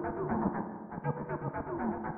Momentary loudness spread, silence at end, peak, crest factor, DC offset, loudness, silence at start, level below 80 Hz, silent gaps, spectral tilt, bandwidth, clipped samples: 6 LU; 0 s; -18 dBFS; 18 dB; under 0.1%; -36 LUFS; 0 s; -56 dBFS; none; -11 dB/octave; 2.9 kHz; under 0.1%